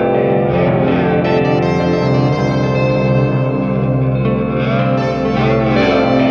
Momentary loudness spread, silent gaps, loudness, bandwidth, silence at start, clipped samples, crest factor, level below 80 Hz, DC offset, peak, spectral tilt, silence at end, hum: 3 LU; none; -14 LUFS; 6.8 kHz; 0 s; under 0.1%; 12 dB; -36 dBFS; under 0.1%; -2 dBFS; -8.5 dB/octave; 0 s; none